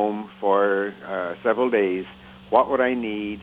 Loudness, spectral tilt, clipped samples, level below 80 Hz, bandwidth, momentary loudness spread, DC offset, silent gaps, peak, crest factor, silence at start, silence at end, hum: -23 LUFS; -8 dB/octave; under 0.1%; -58 dBFS; 4.5 kHz; 9 LU; under 0.1%; none; -2 dBFS; 20 dB; 0 s; 0 s; none